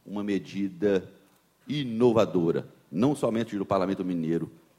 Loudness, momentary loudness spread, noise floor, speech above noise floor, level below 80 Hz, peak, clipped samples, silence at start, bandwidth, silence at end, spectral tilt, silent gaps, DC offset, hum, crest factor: -27 LUFS; 9 LU; -57 dBFS; 31 dB; -66 dBFS; -10 dBFS; under 0.1%; 0.05 s; 14.5 kHz; 0.3 s; -7 dB/octave; none; under 0.1%; none; 18 dB